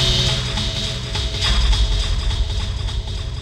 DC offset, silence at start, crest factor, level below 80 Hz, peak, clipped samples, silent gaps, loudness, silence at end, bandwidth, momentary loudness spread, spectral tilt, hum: under 0.1%; 0 s; 14 dB; -22 dBFS; -6 dBFS; under 0.1%; none; -21 LUFS; 0 s; 12 kHz; 8 LU; -3.5 dB/octave; none